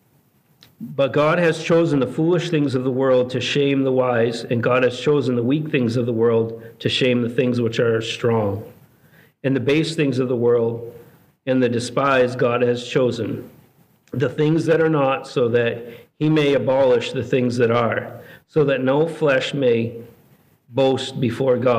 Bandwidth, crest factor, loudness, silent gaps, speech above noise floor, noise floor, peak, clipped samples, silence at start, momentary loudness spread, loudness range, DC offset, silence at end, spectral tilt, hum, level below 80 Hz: 14.5 kHz; 14 dB; -19 LUFS; none; 40 dB; -59 dBFS; -6 dBFS; under 0.1%; 0.8 s; 9 LU; 2 LU; under 0.1%; 0 s; -6.5 dB/octave; none; -62 dBFS